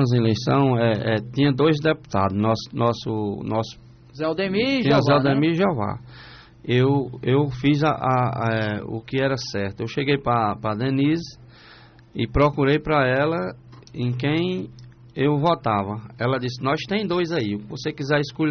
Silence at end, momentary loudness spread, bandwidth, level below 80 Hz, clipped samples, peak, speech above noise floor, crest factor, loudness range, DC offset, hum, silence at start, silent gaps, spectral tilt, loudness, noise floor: 0 s; 10 LU; 6.6 kHz; -46 dBFS; under 0.1%; -6 dBFS; 27 dB; 14 dB; 3 LU; under 0.1%; none; 0 s; none; -5.5 dB/octave; -22 LUFS; -48 dBFS